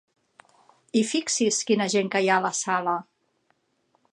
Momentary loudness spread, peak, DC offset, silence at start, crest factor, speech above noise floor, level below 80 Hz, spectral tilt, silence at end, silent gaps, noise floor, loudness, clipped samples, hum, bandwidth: 5 LU; -8 dBFS; under 0.1%; 0.95 s; 18 dB; 46 dB; -78 dBFS; -3 dB/octave; 1.1 s; none; -70 dBFS; -24 LUFS; under 0.1%; none; 11.5 kHz